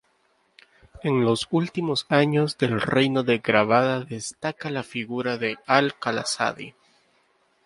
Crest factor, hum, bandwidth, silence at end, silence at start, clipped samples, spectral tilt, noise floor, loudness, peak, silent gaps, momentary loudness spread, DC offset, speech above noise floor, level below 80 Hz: 24 dB; none; 11.5 kHz; 0.95 s; 0.95 s; under 0.1%; -5 dB/octave; -66 dBFS; -23 LUFS; -2 dBFS; none; 10 LU; under 0.1%; 43 dB; -60 dBFS